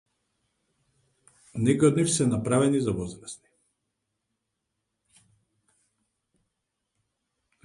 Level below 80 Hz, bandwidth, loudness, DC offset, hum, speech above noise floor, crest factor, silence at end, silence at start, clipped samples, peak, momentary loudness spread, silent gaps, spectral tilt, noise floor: -58 dBFS; 11.5 kHz; -24 LUFS; under 0.1%; none; 58 dB; 22 dB; 4.3 s; 1.55 s; under 0.1%; -8 dBFS; 20 LU; none; -5.5 dB/octave; -82 dBFS